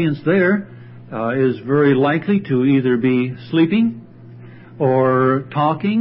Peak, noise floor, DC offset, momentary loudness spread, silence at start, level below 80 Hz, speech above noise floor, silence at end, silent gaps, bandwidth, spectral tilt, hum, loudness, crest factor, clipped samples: -4 dBFS; -39 dBFS; under 0.1%; 7 LU; 0 s; -60 dBFS; 22 dB; 0 s; none; 5.6 kHz; -12.5 dB/octave; none; -17 LUFS; 14 dB; under 0.1%